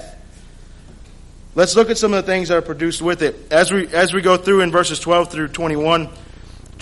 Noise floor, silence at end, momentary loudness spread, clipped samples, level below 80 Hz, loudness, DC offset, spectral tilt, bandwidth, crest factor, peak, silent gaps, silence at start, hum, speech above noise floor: -39 dBFS; 0 s; 7 LU; under 0.1%; -40 dBFS; -16 LUFS; under 0.1%; -4 dB/octave; 11.5 kHz; 16 dB; -2 dBFS; none; 0 s; none; 23 dB